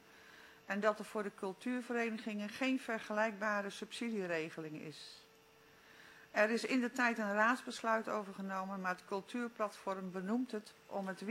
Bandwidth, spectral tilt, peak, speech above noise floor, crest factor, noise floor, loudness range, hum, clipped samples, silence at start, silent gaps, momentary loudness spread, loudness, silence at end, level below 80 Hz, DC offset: 16 kHz; -4.5 dB/octave; -16 dBFS; 26 dB; 22 dB; -65 dBFS; 5 LU; none; under 0.1%; 0.05 s; none; 16 LU; -38 LUFS; 0 s; -86 dBFS; under 0.1%